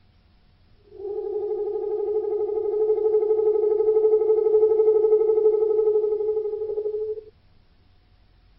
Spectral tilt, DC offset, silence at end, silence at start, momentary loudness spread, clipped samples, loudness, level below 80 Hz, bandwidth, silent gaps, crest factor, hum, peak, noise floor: -7.5 dB/octave; under 0.1%; 1.3 s; 0.9 s; 10 LU; under 0.1%; -22 LUFS; -60 dBFS; 2.2 kHz; none; 14 dB; none; -10 dBFS; -57 dBFS